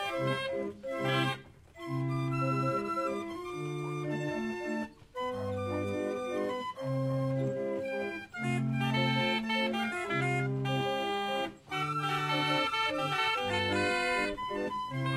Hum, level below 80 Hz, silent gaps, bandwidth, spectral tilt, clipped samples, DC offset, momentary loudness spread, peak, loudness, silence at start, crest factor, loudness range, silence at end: none; -64 dBFS; none; 14.5 kHz; -5.5 dB/octave; under 0.1%; under 0.1%; 8 LU; -16 dBFS; -32 LUFS; 0 s; 16 dB; 5 LU; 0 s